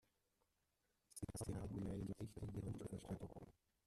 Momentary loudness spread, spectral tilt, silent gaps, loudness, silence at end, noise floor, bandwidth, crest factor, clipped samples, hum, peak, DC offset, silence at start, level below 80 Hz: 10 LU; -6.5 dB/octave; none; -51 LUFS; 0.35 s; -87 dBFS; 13.5 kHz; 18 dB; under 0.1%; none; -32 dBFS; under 0.1%; 1.15 s; -64 dBFS